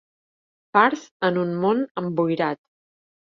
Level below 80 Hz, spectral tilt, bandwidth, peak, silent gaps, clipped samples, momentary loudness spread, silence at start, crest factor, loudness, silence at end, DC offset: -70 dBFS; -6.5 dB/octave; 7.4 kHz; -2 dBFS; 1.11-1.20 s, 1.91-1.95 s; under 0.1%; 7 LU; 0.75 s; 22 dB; -22 LUFS; 0.7 s; under 0.1%